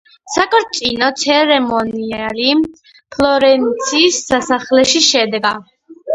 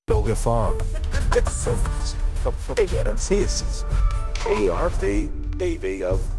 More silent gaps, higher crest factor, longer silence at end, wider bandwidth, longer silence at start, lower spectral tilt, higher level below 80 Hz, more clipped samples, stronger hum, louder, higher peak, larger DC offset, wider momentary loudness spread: neither; about the same, 14 dB vs 16 dB; about the same, 0 s vs 0 s; about the same, 11 kHz vs 12 kHz; first, 0.25 s vs 0.1 s; second, -2 dB/octave vs -5.5 dB/octave; second, -48 dBFS vs -24 dBFS; neither; neither; first, -13 LUFS vs -24 LUFS; first, 0 dBFS vs -6 dBFS; neither; first, 10 LU vs 5 LU